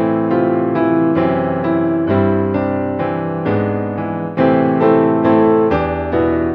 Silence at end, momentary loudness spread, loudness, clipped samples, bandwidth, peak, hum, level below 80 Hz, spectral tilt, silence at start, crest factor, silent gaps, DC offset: 0 s; 7 LU; -15 LUFS; under 0.1%; 5.2 kHz; 0 dBFS; none; -40 dBFS; -10.5 dB/octave; 0 s; 14 dB; none; under 0.1%